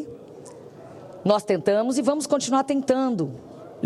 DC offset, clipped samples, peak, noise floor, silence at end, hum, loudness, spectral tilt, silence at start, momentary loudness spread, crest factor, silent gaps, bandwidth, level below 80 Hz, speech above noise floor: under 0.1%; under 0.1%; -6 dBFS; -43 dBFS; 0 s; none; -23 LUFS; -5 dB/octave; 0 s; 21 LU; 18 dB; none; 13 kHz; -68 dBFS; 20 dB